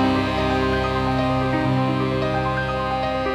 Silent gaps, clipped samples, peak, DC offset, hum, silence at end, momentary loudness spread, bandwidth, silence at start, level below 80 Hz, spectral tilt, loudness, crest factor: none; under 0.1%; -8 dBFS; under 0.1%; none; 0 s; 3 LU; 11.5 kHz; 0 s; -36 dBFS; -7 dB/octave; -21 LUFS; 12 dB